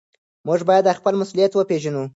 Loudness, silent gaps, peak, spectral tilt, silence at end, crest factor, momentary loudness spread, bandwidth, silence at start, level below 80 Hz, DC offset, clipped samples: -19 LUFS; none; -4 dBFS; -6 dB/octave; 0.05 s; 16 dB; 7 LU; 8 kHz; 0.45 s; -70 dBFS; under 0.1%; under 0.1%